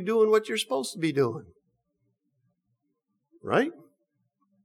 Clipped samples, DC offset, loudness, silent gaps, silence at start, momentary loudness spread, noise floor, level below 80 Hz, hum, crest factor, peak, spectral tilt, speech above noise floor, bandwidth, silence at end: under 0.1%; under 0.1%; -26 LUFS; none; 0 s; 11 LU; -79 dBFS; -76 dBFS; none; 18 dB; -12 dBFS; -5 dB/octave; 53 dB; 14.5 kHz; 0.9 s